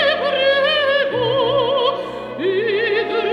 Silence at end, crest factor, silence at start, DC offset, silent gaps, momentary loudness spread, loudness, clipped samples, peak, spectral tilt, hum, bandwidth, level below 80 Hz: 0 s; 12 dB; 0 s; under 0.1%; none; 6 LU; -17 LUFS; under 0.1%; -6 dBFS; -5.5 dB/octave; none; 10 kHz; -56 dBFS